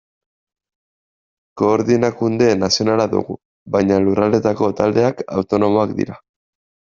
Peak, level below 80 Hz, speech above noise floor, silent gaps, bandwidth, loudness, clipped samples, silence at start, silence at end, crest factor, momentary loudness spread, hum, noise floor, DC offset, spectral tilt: 0 dBFS; -54 dBFS; over 74 dB; 3.45-3.66 s; 7.6 kHz; -17 LUFS; under 0.1%; 1.55 s; 0.7 s; 18 dB; 7 LU; none; under -90 dBFS; under 0.1%; -5.5 dB/octave